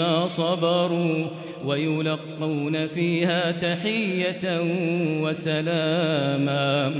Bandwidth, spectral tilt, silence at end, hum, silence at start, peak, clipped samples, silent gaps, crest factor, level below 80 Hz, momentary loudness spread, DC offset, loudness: 4 kHz; -10.5 dB/octave; 0 s; none; 0 s; -10 dBFS; under 0.1%; none; 14 dB; -68 dBFS; 5 LU; under 0.1%; -24 LUFS